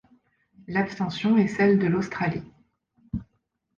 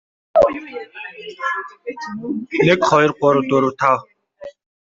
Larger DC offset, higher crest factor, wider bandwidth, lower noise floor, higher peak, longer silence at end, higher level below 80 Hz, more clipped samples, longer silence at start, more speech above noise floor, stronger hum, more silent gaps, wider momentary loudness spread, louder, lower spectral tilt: neither; about the same, 16 dB vs 18 dB; about the same, 7.4 kHz vs 7.8 kHz; first, -74 dBFS vs -39 dBFS; second, -10 dBFS vs -2 dBFS; first, 0.55 s vs 0.3 s; about the same, -54 dBFS vs -54 dBFS; neither; first, 0.7 s vs 0.35 s; first, 50 dB vs 20 dB; neither; neither; about the same, 16 LU vs 18 LU; second, -24 LUFS vs -17 LUFS; first, -7.5 dB/octave vs -6 dB/octave